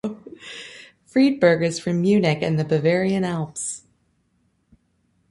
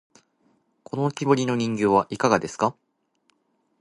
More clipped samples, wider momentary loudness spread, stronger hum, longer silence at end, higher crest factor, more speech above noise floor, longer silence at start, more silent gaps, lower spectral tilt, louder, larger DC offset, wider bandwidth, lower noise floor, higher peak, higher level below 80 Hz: neither; first, 19 LU vs 6 LU; neither; first, 1.5 s vs 1.1 s; about the same, 20 dB vs 22 dB; about the same, 47 dB vs 48 dB; second, 0.05 s vs 0.95 s; neither; about the same, -6 dB/octave vs -6 dB/octave; about the same, -21 LUFS vs -23 LUFS; neither; about the same, 11.5 kHz vs 11.5 kHz; about the same, -67 dBFS vs -70 dBFS; about the same, -4 dBFS vs -4 dBFS; about the same, -60 dBFS vs -62 dBFS